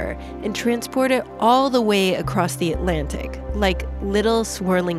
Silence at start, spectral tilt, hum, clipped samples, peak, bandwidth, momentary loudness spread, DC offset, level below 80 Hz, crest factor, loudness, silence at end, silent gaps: 0 s; -5 dB/octave; none; under 0.1%; -4 dBFS; 15.5 kHz; 11 LU; under 0.1%; -32 dBFS; 16 dB; -21 LUFS; 0 s; none